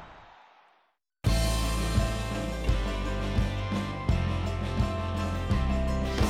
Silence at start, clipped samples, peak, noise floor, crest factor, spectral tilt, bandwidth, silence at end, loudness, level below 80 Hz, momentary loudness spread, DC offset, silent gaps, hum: 0 s; under 0.1%; -14 dBFS; -70 dBFS; 14 dB; -5.5 dB/octave; 15.5 kHz; 0 s; -30 LUFS; -32 dBFS; 4 LU; under 0.1%; none; none